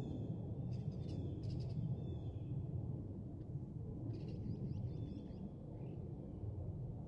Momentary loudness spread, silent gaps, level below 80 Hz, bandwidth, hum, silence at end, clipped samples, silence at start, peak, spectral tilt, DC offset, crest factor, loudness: 5 LU; none; -58 dBFS; 6.8 kHz; none; 0 s; under 0.1%; 0 s; -30 dBFS; -10.5 dB/octave; under 0.1%; 14 dB; -46 LUFS